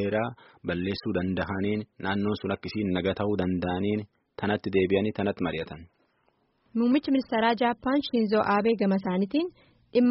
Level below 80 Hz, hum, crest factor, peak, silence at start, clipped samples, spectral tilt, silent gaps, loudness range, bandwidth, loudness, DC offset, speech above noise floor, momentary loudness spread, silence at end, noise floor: -58 dBFS; none; 16 dB; -10 dBFS; 0 s; under 0.1%; -5 dB/octave; none; 4 LU; 5.8 kHz; -27 LUFS; under 0.1%; 43 dB; 9 LU; 0 s; -70 dBFS